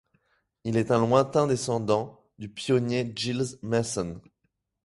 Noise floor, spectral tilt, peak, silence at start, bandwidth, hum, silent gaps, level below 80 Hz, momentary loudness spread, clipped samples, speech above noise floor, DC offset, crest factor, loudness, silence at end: -77 dBFS; -5.5 dB/octave; -6 dBFS; 0.65 s; 11.5 kHz; none; none; -58 dBFS; 16 LU; under 0.1%; 51 dB; under 0.1%; 20 dB; -26 LUFS; 0.65 s